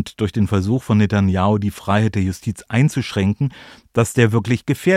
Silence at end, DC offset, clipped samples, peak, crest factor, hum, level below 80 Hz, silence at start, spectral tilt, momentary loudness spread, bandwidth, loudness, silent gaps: 0 s; under 0.1%; under 0.1%; -2 dBFS; 16 dB; none; -46 dBFS; 0 s; -6.5 dB/octave; 7 LU; 15 kHz; -19 LUFS; none